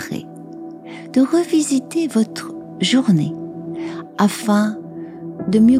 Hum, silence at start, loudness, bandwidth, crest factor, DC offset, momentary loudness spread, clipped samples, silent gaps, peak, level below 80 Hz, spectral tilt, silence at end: none; 0 s; -19 LUFS; 15.5 kHz; 18 dB; under 0.1%; 18 LU; under 0.1%; none; -2 dBFS; -58 dBFS; -5.5 dB/octave; 0 s